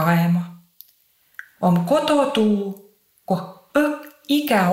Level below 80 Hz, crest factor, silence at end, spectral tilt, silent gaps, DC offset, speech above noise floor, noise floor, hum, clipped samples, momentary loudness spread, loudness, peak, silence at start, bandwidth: -64 dBFS; 16 dB; 0 s; -6.5 dB/octave; none; under 0.1%; 42 dB; -60 dBFS; none; under 0.1%; 20 LU; -20 LUFS; -4 dBFS; 0 s; 16.5 kHz